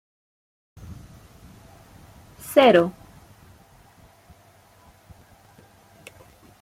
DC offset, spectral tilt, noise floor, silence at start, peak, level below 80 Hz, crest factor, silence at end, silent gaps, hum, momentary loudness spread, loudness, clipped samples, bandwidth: under 0.1%; -5 dB/octave; -54 dBFS; 0.9 s; -4 dBFS; -58 dBFS; 24 dB; 3.7 s; none; none; 31 LU; -18 LUFS; under 0.1%; 16.5 kHz